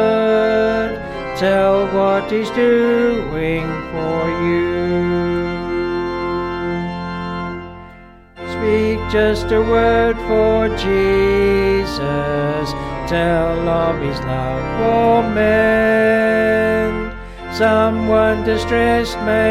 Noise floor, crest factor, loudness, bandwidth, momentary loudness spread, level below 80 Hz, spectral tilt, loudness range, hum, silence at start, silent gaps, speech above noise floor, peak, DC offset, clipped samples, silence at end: -41 dBFS; 14 dB; -17 LUFS; 13.5 kHz; 10 LU; -32 dBFS; -6.5 dB/octave; 6 LU; none; 0 s; none; 25 dB; -2 dBFS; under 0.1%; under 0.1%; 0 s